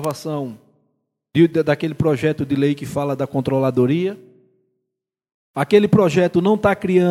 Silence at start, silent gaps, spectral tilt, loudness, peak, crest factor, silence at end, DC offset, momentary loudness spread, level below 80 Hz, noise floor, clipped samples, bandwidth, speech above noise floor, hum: 0 s; 5.34-5.54 s; -7.5 dB/octave; -18 LUFS; 0 dBFS; 18 dB; 0 s; under 0.1%; 11 LU; -52 dBFS; -81 dBFS; under 0.1%; 16 kHz; 64 dB; none